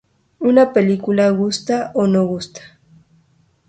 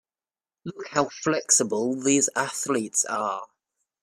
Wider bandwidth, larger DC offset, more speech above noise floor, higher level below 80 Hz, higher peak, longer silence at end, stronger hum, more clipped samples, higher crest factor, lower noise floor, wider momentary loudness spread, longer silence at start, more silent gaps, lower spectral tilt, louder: second, 9.2 kHz vs 15 kHz; neither; second, 42 dB vs over 65 dB; first, -56 dBFS vs -70 dBFS; first, 0 dBFS vs -6 dBFS; first, 1 s vs 0.6 s; neither; neither; about the same, 18 dB vs 20 dB; second, -57 dBFS vs under -90 dBFS; second, 9 LU vs 15 LU; second, 0.4 s vs 0.65 s; neither; first, -6.5 dB/octave vs -2.5 dB/octave; first, -16 LUFS vs -24 LUFS